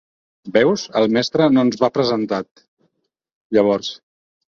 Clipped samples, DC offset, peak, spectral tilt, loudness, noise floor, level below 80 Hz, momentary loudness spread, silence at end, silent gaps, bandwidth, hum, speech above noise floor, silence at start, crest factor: under 0.1%; under 0.1%; -2 dBFS; -5.5 dB/octave; -18 LUFS; -73 dBFS; -60 dBFS; 9 LU; 0.65 s; 2.51-2.55 s, 2.68-2.77 s, 3.35-3.50 s; 7.4 kHz; none; 56 dB; 0.45 s; 18 dB